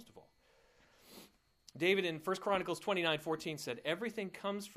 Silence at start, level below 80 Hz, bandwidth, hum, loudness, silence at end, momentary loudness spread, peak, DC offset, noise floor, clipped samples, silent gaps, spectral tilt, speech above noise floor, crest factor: 0 s; -76 dBFS; 15.5 kHz; none; -37 LUFS; 0 s; 24 LU; -18 dBFS; under 0.1%; -70 dBFS; under 0.1%; none; -4.5 dB/octave; 33 dB; 22 dB